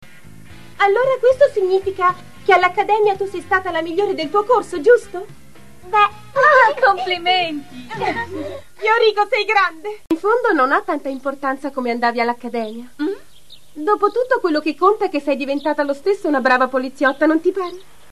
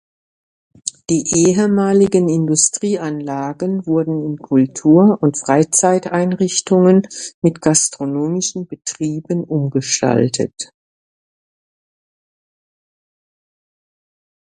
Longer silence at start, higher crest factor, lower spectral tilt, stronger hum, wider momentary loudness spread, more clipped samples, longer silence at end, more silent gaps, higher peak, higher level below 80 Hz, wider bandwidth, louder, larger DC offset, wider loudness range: second, 0.25 s vs 0.85 s; about the same, 16 dB vs 18 dB; about the same, -4.5 dB/octave vs -5 dB/octave; neither; about the same, 11 LU vs 11 LU; neither; second, 0.3 s vs 3.85 s; second, none vs 7.34-7.42 s; about the same, -2 dBFS vs 0 dBFS; about the same, -56 dBFS vs -56 dBFS; first, 13.5 kHz vs 11 kHz; about the same, -17 LUFS vs -16 LUFS; first, 1% vs under 0.1%; second, 4 LU vs 7 LU